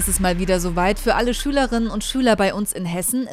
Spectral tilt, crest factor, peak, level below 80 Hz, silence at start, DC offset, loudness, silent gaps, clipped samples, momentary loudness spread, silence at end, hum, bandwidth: -4 dB/octave; 16 dB; -4 dBFS; -30 dBFS; 0 s; under 0.1%; -20 LUFS; none; under 0.1%; 5 LU; 0 s; none; 16 kHz